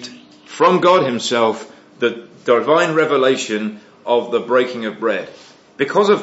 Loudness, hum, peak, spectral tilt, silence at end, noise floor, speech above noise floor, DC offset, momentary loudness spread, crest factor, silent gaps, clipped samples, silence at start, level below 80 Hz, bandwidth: -17 LUFS; none; 0 dBFS; -4.5 dB/octave; 0 s; -39 dBFS; 23 dB; under 0.1%; 14 LU; 16 dB; none; under 0.1%; 0 s; -72 dBFS; 8 kHz